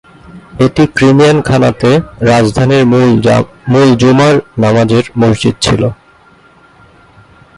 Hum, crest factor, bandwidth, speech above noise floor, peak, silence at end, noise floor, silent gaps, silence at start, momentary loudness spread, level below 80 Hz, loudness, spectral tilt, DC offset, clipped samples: none; 10 dB; 11.5 kHz; 35 dB; 0 dBFS; 1.65 s; -43 dBFS; none; 0.3 s; 5 LU; -36 dBFS; -9 LUFS; -6.5 dB/octave; under 0.1%; under 0.1%